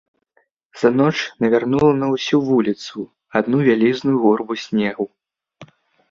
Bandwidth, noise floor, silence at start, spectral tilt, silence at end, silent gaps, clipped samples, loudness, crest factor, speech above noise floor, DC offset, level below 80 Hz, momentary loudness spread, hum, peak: 7.6 kHz; -64 dBFS; 0.75 s; -6.5 dB/octave; 0.45 s; none; under 0.1%; -18 LUFS; 16 dB; 47 dB; under 0.1%; -56 dBFS; 10 LU; none; -2 dBFS